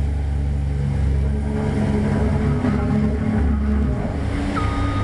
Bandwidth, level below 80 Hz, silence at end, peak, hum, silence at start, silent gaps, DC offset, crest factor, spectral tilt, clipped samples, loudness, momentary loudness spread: 11 kHz; -24 dBFS; 0 s; -8 dBFS; none; 0 s; none; 0.5%; 12 dB; -8.5 dB/octave; under 0.1%; -21 LUFS; 3 LU